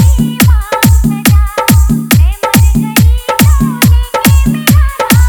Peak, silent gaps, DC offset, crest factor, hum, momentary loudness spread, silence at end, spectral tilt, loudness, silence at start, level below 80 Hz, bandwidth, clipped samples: 0 dBFS; none; under 0.1%; 8 dB; none; 1 LU; 0 s; -5 dB/octave; -9 LUFS; 0 s; -12 dBFS; over 20 kHz; 1%